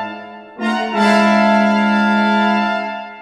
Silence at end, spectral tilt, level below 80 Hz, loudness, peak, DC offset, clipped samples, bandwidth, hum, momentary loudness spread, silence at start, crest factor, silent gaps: 0 s; -6 dB/octave; -62 dBFS; -14 LUFS; 0 dBFS; under 0.1%; under 0.1%; 11 kHz; none; 14 LU; 0 s; 14 dB; none